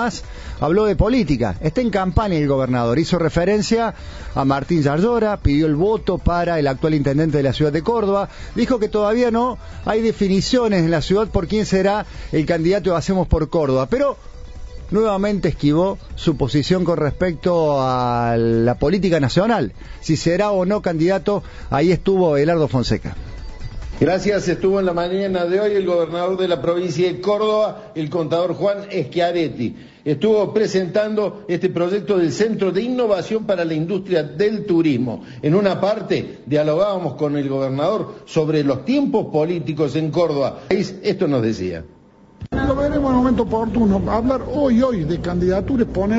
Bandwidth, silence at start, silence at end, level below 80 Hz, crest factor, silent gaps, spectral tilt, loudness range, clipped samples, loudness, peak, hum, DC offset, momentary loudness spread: 8 kHz; 0 s; 0 s; -34 dBFS; 16 dB; none; -7 dB/octave; 2 LU; under 0.1%; -19 LUFS; -2 dBFS; none; under 0.1%; 7 LU